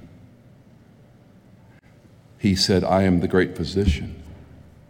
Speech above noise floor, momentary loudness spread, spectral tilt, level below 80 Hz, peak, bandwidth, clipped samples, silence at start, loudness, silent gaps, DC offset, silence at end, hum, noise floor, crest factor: 31 dB; 17 LU; -5.5 dB/octave; -38 dBFS; -6 dBFS; 16.5 kHz; under 0.1%; 0.05 s; -21 LUFS; none; under 0.1%; 0.45 s; none; -51 dBFS; 18 dB